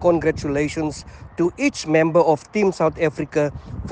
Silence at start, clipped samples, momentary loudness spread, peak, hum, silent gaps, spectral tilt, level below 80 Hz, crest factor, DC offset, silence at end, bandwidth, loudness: 0 s; under 0.1%; 10 LU; -4 dBFS; none; none; -6 dB/octave; -44 dBFS; 16 dB; under 0.1%; 0 s; 9.8 kHz; -20 LUFS